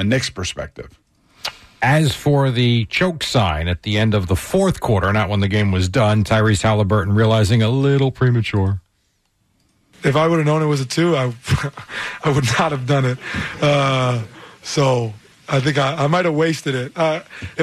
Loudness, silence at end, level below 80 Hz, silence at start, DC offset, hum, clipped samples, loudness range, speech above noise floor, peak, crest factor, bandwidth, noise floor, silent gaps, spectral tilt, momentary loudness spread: -18 LUFS; 0 s; -40 dBFS; 0 s; under 0.1%; none; under 0.1%; 3 LU; 48 dB; -6 dBFS; 12 dB; 13.5 kHz; -65 dBFS; none; -6 dB/octave; 10 LU